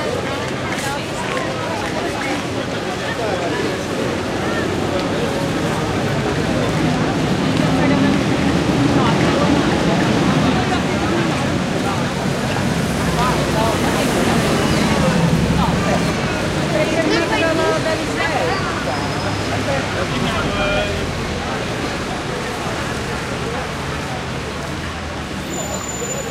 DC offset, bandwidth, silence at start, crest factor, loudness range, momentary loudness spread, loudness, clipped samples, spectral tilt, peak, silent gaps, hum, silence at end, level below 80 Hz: under 0.1%; 16 kHz; 0 s; 16 dB; 6 LU; 7 LU; -19 LUFS; under 0.1%; -5 dB/octave; -2 dBFS; none; none; 0 s; -34 dBFS